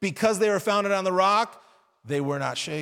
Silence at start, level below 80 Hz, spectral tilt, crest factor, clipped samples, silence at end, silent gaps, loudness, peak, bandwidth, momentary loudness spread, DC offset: 0 s; -70 dBFS; -4.5 dB/octave; 16 dB; under 0.1%; 0 s; none; -24 LUFS; -8 dBFS; 17 kHz; 8 LU; under 0.1%